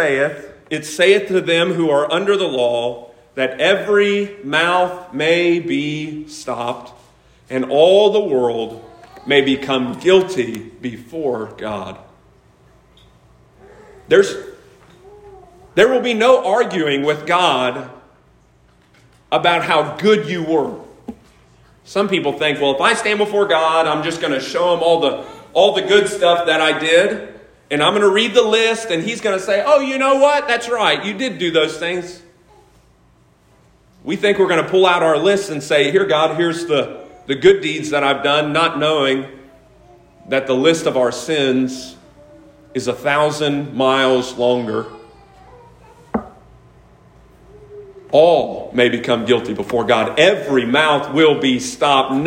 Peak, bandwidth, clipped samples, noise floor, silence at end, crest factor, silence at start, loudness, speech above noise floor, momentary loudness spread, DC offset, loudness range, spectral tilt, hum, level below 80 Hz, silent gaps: 0 dBFS; 16 kHz; under 0.1%; -53 dBFS; 0 s; 18 dB; 0 s; -16 LUFS; 37 dB; 13 LU; under 0.1%; 6 LU; -4 dB/octave; none; -54 dBFS; none